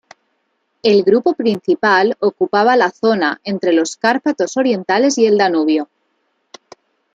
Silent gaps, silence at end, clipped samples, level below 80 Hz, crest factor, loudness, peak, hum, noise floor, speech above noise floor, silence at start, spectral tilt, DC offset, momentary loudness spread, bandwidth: none; 1.3 s; under 0.1%; -66 dBFS; 16 dB; -15 LUFS; 0 dBFS; none; -67 dBFS; 53 dB; 0.85 s; -4.5 dB/octave; under 0.1%; 5 LU; 9.2 kHz